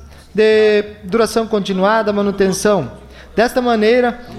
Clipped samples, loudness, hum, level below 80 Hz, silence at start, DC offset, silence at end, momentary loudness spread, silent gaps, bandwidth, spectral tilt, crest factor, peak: under 0.1%; -15 LUFS; none; -42 dBFS; 0 s; under 0.1%; 0 s; 7 LU; none; 14 kHz; -5 dB/octave; 12 dB; -4 dBFS